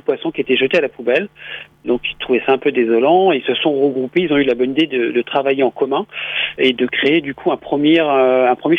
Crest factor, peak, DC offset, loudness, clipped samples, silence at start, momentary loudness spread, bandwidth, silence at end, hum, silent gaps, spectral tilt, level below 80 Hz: 14 dB; -2 dBFS; under 0.1%; -16 LUFS; under 0.1%; 0.1 s; 8 LU; 6.2 kHz; 0 s; none; none; -7 dB/octave; -56 dBFS